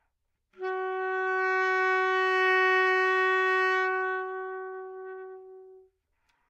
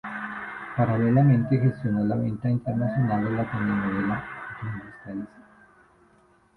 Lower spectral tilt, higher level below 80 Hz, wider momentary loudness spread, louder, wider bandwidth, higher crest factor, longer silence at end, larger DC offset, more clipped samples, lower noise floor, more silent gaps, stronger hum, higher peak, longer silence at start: second, -1 dB/octave vs -10.5 dB/octave; second, -82 dBFS vs -54 dBFS; about the same, 18 LU vs 16 LU; about the same, -26 LUFS vs -25 LUFS; first, 8.6 kHz vs 4.3 kHz; about the same, 14 dB vs 18 dB; second, 0.7 s vs 1.15 s; neither; neither; first, -78 dBFS vs -60 dBFS; neither; neither; second, -14 dBFS vs -8 dBFS; first, 0.6 s vs 0.05 s